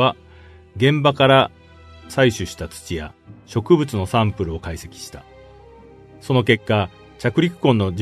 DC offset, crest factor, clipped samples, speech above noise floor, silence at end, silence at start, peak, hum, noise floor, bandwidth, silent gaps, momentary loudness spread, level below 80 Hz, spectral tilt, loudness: under 0.1%; 20 dB; under 0.1%; 26 dB; 0 s; 0 s; 0 dBFS; none; -45 dBFS; 13.5 kHz; none; 19 LU; -44 dBFS; -6 dB/octave; -19 LUFS